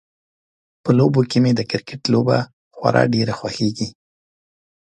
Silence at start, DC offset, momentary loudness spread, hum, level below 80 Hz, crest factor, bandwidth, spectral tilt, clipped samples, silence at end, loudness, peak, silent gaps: 0.85 s; under 0.1%; 11 LU; none; -56 dBFS; 20 dB; 9.6 kHz; -6.5 dB/octave; under 0.1%; 1 s; -19 LUFS; 0 dBFS; 2.53-2.71 s